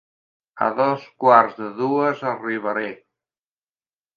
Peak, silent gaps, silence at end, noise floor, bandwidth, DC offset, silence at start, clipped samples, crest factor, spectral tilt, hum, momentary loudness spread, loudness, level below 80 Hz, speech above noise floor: 0 dBFS; none; 1.2 s; under -90 dBFS; 7 kHz; under 0.1%; 0.55 s; under 0.1%; 22 dB; -7.5 dB/octave; none; 11 LU; -20 LUFS; -78 dBFS; over 70 dB